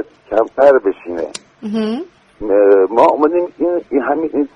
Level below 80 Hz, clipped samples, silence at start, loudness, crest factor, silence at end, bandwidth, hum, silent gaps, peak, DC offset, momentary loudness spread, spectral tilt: -50 dBFS; under 0.1%; 0 s; -14 LUFS; 14 dB; 0.1 s; 10.5 kHz; none; none; 0 dBFS; under 0.1%; 15 LU; -6 dB/octave